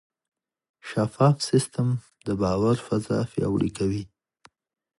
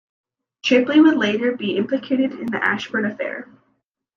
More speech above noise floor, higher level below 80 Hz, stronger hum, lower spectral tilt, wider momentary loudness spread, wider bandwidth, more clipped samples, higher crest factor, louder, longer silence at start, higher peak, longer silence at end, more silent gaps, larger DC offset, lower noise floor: second, 36 dB vs 51 dB; first, -52 dBFS vs -68 dBFS; neither; about the same, -6.5 dB/octave vs -5.5 dB/octave; about the same, 10 LU vs 12 LU; first, 11.5 kHz vs 7.2 kHz; neither; about the same, 20 dB vs 16 dB; second, -25 LUFS vs -19 LUFS; first, 0.85 s vs 0.65 s; about the same, -6 dBFS vs -4 dBFS; first, 0.95 s vs 0.75 s; neither; neither; second, -59 dBFS vs -69 dBFS